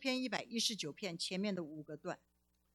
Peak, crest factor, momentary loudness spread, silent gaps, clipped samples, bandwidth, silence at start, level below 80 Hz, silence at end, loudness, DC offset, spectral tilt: -20 dBFS; 22 dB; 11 LU; none; under 0.1%; 17 kHz; 0 s; -82 dBFS; 0.6 s; -40 LUFS; under 0.1%; -3 dB/octave